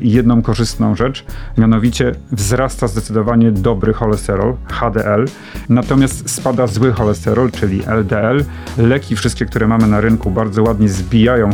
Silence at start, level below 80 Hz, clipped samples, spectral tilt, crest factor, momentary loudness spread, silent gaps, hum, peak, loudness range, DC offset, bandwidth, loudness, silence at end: 0 s; -28 dBFS; under 0.1%; -6.5 dB/octave; 14 dB; 6 LU; none; none; 0 dBFS; 1 LU; under 0.1%; 17 kHz; -14 LUFS; 0 s